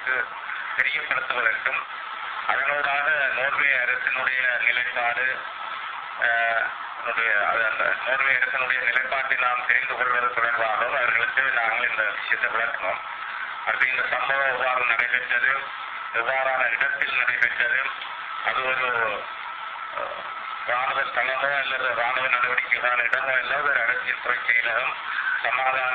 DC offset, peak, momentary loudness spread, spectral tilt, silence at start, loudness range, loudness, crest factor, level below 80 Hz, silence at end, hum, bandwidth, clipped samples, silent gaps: under 0.1%; -6 dBFS; 10 LU; -4 dB/octave; 0 s; 3 LU; -23 LUFS; 20 dB; -66 dBFS; 0 s; none; 5.8 kHz; under 0.1%; none